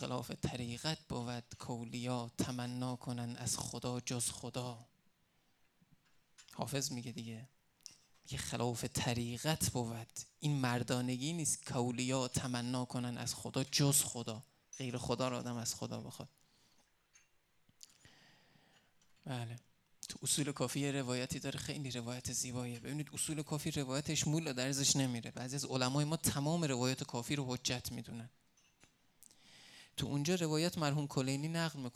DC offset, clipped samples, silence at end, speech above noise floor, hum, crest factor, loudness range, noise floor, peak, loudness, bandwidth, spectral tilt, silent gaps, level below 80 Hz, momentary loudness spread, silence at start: under 0.1%; under 0.1%; 0.05 s; 37 dB; none; 22 dB; 10 LU; -75 dBFS; -18 dBFS; -38 LUFS; 16.5 kHz; -4 dB/octave; none; -68 dBFS; 13 LU; 0 s